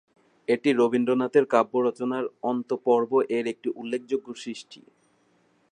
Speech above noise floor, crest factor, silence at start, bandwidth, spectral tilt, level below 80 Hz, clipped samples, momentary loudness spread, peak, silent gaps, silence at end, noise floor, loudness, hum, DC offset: 40 dB; 20 dB; 0.5 s; 10 kHz; -6 dB/octave; -78 dBFS; under 0.1%; 13 LU; -6 dBFS; none; 0.95 s; -65 dBFS; -25 LUFS; none; under 0.1%